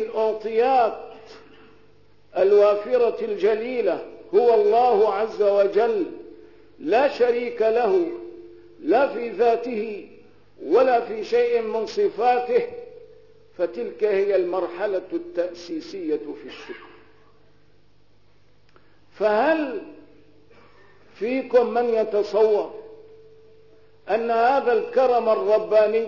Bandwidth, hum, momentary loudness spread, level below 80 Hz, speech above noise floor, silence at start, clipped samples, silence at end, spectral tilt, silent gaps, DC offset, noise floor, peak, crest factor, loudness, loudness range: 6 kHz; 50 Hz at -65 dBFS; 15 LU; -66 dBFS; 40 dB; 0 s; under 0.1%; 0 s; -5.5 dB/octave; none; 0.3%; -60 dBFS; -8 dBFS; 14 dB; -22 LUFS; 8 LU